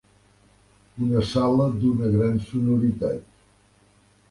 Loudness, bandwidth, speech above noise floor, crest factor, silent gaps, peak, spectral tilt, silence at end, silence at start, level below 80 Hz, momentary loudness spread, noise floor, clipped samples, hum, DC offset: -23 LUFS; 11.5 kHz; 37 dB; 16 dB; none; -8 dBFS; -8.5 dB/octave; 1.1 s; 0.95 s; -48 dBFS; 7 LU; -59 dBFS; under 0.1%; 50 Hz at -40 dBFS; under 0.1%